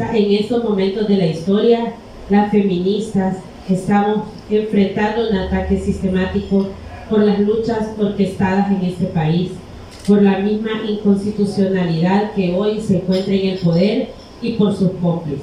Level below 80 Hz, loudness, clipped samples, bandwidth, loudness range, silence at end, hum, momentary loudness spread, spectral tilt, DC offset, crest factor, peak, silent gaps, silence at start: -38 dBFS; -17 LUFS; under 0.1%; 10.5 kHz; 1 LU; 0 s; none; 7 LU; -8 dB/octave; under 0.1%; 14 dB; -2 dBFS; none; 0 s